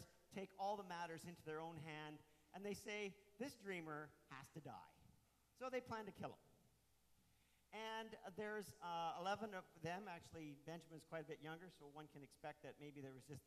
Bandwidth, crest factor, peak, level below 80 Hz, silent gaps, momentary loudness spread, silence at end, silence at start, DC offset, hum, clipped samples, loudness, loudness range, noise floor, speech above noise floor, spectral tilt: 13.5 kHz; 18 dB; -34 dBFS; -84 dBFS; none; 12 LU; 0.05 s; 0 s; under 0.1%; none; under 0.1%; -53 LUFS; 5 LU; -78 dBFS; 26 dB; -5 dB/octave